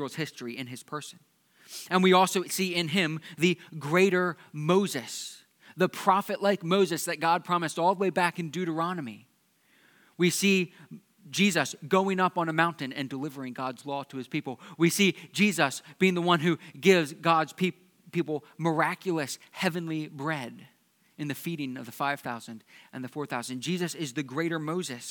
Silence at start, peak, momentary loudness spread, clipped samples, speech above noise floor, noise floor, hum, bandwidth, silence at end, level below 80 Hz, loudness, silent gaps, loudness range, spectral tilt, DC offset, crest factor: 0 s; -6 dBFS; 14 LU; under 0.1%; 38 dB; -67 dBFS; none; 19 kHz; 0 s; -86 dBFS; -28 LUFS; none; 8 LU; -4.5 dB/octave; under 0.1%; 22 dB